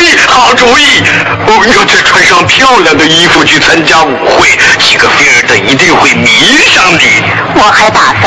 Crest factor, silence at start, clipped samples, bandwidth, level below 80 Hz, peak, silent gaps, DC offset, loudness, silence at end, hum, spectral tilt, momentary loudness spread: 4 dB; 0 s; 6%; 11 kHz; -34 dBFS; 0 dBFS; none; under 0.1%; -3 LUFS; 0 s; none; -2.5 dB/octave; 3 LU